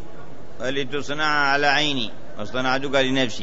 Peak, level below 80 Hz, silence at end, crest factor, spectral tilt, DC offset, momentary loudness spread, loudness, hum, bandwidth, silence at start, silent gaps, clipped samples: -4 dBFS; -52 dBFS; 0 s; 18 dB; -4 dB/octave; 5%; 13 LU; -22 LUFS; none; 8 kHz; 0 s; none; under 0.1%